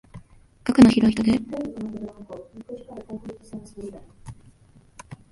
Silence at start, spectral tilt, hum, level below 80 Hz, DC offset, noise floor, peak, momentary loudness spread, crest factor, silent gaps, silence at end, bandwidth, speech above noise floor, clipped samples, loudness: 0.15 s; -6.5 dB/octave; none; -50 dBFS; under 0.1%; -54 dBFS; -2 dBFS; 25 LU; 22 dB; none; 0.2 s; 11.5 kHz; 27 dB; under 0.1%; -20 LUFS